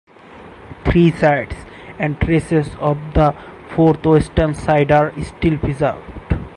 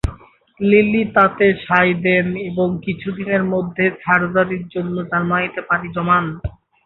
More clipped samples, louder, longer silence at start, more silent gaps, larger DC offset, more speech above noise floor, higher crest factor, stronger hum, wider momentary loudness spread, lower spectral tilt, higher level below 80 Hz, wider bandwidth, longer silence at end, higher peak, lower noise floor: neither; about the same, -17 LUFS vs -17 LUFS; first, 0.3 s vs 0.05 s; neither; neither; about the same, 24 dB vs 26 dB; about the same, 14 dB vs 16 dB; neither; first, 13 LU vs 10 LU; about the same, -8 dB/octave vs -8.5 dB/octave; first, -30 dBFS vs -40 dBFS; first, 11 kHz vs 5.8 kHz; second, 0 s vs 0.35 s; about the same, -2 dBFS vs -2 dBFS; second, -40 dBFS vs -44 dBFS